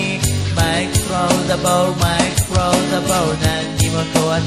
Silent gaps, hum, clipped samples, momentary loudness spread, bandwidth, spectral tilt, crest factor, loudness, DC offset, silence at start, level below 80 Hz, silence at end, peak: none; none; under 0.1%; 2 LU; 15 kHz; -4.5 dB/octave; 16 dB; -16 LUFS; 0.3%; 0 s; -30 dBFS; 0 s; -2 dBFS